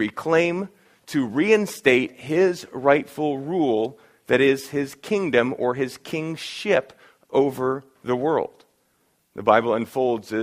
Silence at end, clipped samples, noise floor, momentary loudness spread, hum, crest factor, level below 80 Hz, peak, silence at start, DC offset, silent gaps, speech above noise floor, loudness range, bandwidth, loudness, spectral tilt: 0 s; under 0.1%; -67 dBFS; 10 LU; none; 22 dB; -64 dBFS; -2 dBFS; 0 s; under 0.1%; none; 45 dB; 4 LU; 15.5 kHz; -22 LUFS; -5.5 dB/octave